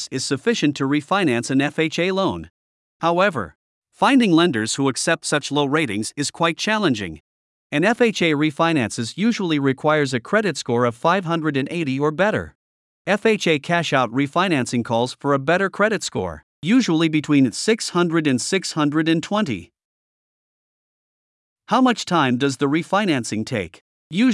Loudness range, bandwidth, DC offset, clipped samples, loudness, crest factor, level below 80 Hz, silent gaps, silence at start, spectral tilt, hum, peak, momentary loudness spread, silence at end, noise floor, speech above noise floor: 3 LU; 12 kHz; under 0.1%; under 0.1%; -20 LUFS; 18 dB; -62 dBFS; 2.50-3.00 s, 3.55-3.82 s, 7.20-7.70 s, 12.55-13.05 s, 16.43-16.62 s, 19.85-21.56 s, 23.81-24.10 s; 0 s; -5 dB/octave; none; -2 dBFS; 7 LU; 0 s; under -90 dBFS; over 70 dB